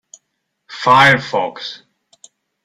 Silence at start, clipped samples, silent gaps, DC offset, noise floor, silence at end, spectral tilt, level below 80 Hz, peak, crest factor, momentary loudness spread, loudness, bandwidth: 0.7 s; under 0.1%; none; under 0.1%; -72 dBFS; 0.9 s; -4 dB/octave; -56 dBFS; 0 dBFS; 18 dB; 20 LU; -13 LUFS; 16 kHz